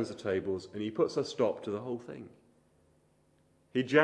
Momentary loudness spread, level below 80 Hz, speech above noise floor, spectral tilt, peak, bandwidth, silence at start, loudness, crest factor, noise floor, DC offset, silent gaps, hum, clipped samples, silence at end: 13 LU; -74 dBFS; 37 dB; -5.5 dB/octave; -10 dBFS; 10.5 kHz; 0 s; -34 LUFS; 24 dB; -69 dBFS; under 0.1%; none; none; under 0.1%; 0 s